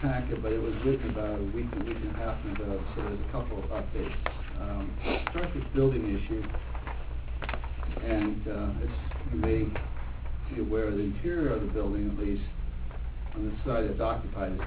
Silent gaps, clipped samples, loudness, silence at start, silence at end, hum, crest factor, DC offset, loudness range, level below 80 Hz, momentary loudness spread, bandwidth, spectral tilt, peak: none; under 0.1%; -33 LUFS; 0 s; 0 s; none; 18 dB; under 0.1%; 3 LU; -34 dBFS; 9 LU; 4 kHz; -11 dB/octave; -12 dBFS